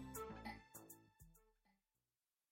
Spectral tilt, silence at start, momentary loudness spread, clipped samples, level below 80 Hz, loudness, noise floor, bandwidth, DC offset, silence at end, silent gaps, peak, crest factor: -4 dB/octave; 0 s; 17 LU; under 0.1%; -70 dBFS; -55 LUFS; under -90 dBFS; 16.5 kHz; under 0.1%; 0.8 s; none; -38 dBFS; 20 dB